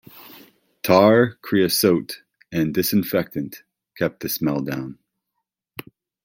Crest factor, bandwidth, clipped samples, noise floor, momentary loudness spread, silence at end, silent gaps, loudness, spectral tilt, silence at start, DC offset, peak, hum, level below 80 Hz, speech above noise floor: 20 dB; 17 kHz; under 0.1%; -80 dBFS; 21 LU; 1.3 s; none; -20 LUFS; -5 dB/octave; 0.15 s; under 0.1%; -2 dBFS; none; -60 dBFS; 60 dB